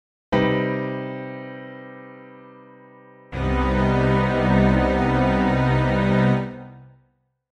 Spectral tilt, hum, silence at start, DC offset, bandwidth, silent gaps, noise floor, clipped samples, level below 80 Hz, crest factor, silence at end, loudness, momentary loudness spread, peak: -8 dB/octave; none; 0.3 s; under 0.1%; 8.2 kHz; none; -66 dBFS; under 0.1%; -34 dBFS; 16 dB; 0.65 s; -21 LUFS; 19 LU; -6 dBFS